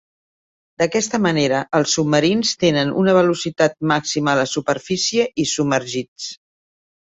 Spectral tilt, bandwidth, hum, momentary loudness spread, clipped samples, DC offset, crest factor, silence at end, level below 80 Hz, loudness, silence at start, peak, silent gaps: -4 dB/octave; 8.4 kHz; none; 6 LU; under 0.1%; under 0.1%; 18 dB; 0.75 s; -56 dBFS; -18 LUFS; 0.8 s; -2 dBFS; 6.08-6.16 s